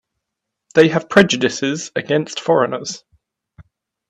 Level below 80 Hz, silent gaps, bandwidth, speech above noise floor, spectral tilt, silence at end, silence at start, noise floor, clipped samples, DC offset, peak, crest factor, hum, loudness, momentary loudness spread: -58 dBFS; none; 10.5 kHz; 64 dB; -4.5 dB/octave; 1.15 s; 0.75 s; -80 dBFS; under 0.1%; under 0.1%; 0 dBFS; 18 dB; none; -17 LUFS; 12 LU